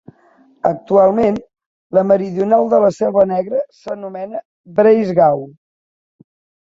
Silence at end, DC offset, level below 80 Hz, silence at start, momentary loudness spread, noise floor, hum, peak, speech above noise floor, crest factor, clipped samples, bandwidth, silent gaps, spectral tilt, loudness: 1.15 s; under 0.1%; -56 dBFS; 0.65 s; 15 LU; -52 dBFS; none; 0 dBFS; 37 dB; 16 dB; under 0.1%; 7.6 kHz; 1.66-1.90 s, 4.45-4.64 s; -8.5 dB/octave; -15 LUFS